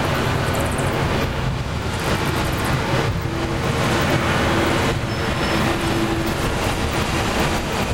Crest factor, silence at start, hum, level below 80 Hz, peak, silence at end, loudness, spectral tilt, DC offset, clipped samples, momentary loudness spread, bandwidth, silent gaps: 14 dB; 0 s; none; -30 dBFS; -6 dBFS; 0 s; -20 LUFS; -5 dB/octave; 0.6%; under 0.1%; 4 LU; 17 kHz; none